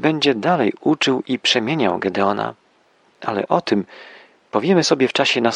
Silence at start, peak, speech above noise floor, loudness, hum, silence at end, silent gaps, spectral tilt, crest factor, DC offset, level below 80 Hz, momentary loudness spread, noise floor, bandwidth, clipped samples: 0 s; -2 dBFS; 39 dB; -18 LUFS; none; 0 s; none; -4.5 dB/octave; 18 dB; under 0.1%; -66 dBFS; 9 LU; -57 dBFS; 11 kHz; under 0.1%